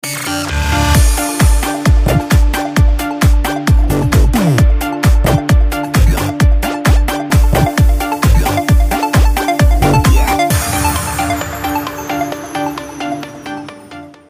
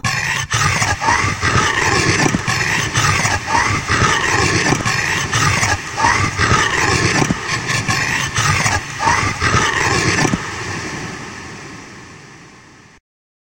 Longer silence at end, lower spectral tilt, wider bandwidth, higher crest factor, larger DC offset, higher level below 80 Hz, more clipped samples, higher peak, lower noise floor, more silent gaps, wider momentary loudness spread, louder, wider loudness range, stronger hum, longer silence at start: second, 0.2 s vs 1.05 s; first, -5.5 dB/octave vs -3 dB/octave; about the same, 16 kHz vs 16.5 kHz; second, 12 dB vs 18 dB; neither; first, -14 dBFS vs -36 dBFS; neither; about the same, 0 dBFS vs 0 dBFS; second, -33 dBFS vs -43 dBFS; neither; about the same, 9 LU vs 10 LU; about the same, -13 LUFS vs -15 LUFS; about the same, 4 LU vs 4 LU; neither; about the same, 0.05 s vs 0.05 s